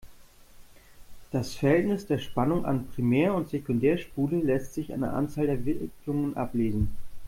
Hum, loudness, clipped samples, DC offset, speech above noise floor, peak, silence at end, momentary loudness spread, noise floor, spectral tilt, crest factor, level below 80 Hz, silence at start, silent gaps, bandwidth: none; -28 LUFS; under 0.1%; under 0.1%; 24 dB; -12 dBFS; 0 s; 8 LU; -51 dBFS; -7.5 dB/octave; 16 dB; -46 dBFS; 0.05 s; none; 16.5 kHz